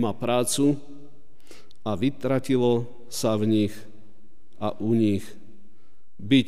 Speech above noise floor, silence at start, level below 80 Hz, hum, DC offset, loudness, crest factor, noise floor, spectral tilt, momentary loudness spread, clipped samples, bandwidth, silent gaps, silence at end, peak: 37 dB; 0 s; -62 dBFS; none; 2%; -25 LUFS; 18 dB; -60 dBFS; -5.5 dB/octave; 12 LU; under 0.1%; 15.5 kHz; none; 0 s; -8 dBFS